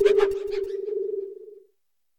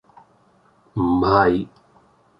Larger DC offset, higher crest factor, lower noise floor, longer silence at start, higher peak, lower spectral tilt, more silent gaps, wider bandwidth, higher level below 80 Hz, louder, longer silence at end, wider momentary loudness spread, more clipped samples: neither; about the same, 18 dB vs 20 dB; first, -76 dBFS vs -57 dBFS; second, 0 s vs 0.95 s; second, -8 dBFS vs -2 dBFS; second, -4.5 dB/octave vs -9 dB/octave; neither; first, 9.2 kHz vs 5.8 kHz; second, -56 dBFS vs -44 dBFS; second, -26 LUFS vs -19 LUFS; second, 0.6 s vs 0.75 s; first, 21 LU vs 16 LU; neither